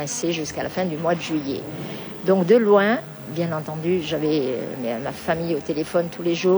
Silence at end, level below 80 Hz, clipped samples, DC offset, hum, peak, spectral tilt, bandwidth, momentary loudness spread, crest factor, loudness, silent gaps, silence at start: 0 s; -56 dBFS; under 0.1%; under 0.1%; none; -6 dBFS; -5.5 dB/octave; over 20 kHz; 11 LU; 16 dB; -23 LUFS; none; 0 s